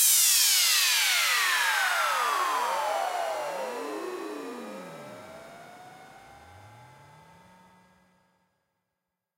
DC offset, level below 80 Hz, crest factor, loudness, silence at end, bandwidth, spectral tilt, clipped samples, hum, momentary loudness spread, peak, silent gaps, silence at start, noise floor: under 0.1%; -76 dBFS; 18 dB; -24 LUFS; 2.5 s; 16 kHz; 1.5 dB/octave; under 0.1%; none; 24 LU; -10 dBFS; none; 0 s; -85 dBFS